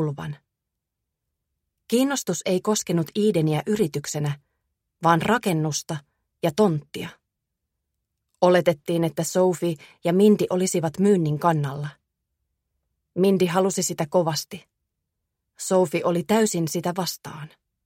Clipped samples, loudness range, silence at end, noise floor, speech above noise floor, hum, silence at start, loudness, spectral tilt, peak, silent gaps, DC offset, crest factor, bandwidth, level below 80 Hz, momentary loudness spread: under 0.1%; 4 LU; 0.4 s; -83 dBFS; 61 dB; none; 0 s; -23 LUFS; -5.5 dB/octave; -4 dBFS; none; under 0.1%; 20 dB; 16.5 kHz; -64 dBFS; 15 LU